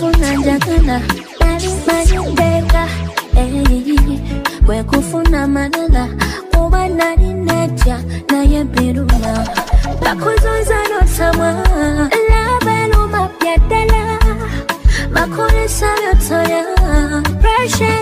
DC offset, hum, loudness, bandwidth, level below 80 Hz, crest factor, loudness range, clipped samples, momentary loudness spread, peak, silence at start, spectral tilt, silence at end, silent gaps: under 0.1%; none; -14 LUFS; 16 kHz; -14 dBFS; 12 dB; 1 LU; under 0.1%; 4 LU; 0 dBFS; 0 s; -5.5 dB/octave; 0 s; none